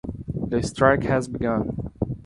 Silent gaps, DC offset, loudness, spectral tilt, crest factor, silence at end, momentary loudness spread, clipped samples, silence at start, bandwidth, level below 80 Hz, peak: none; under 0.1%; -24 LUFS; -6.5 dB/octave; 22 dB; 0 s; 11 LU; under 0.1%; 0.05 s; 11.5 kHz; -40 dBFS; -2 dBFS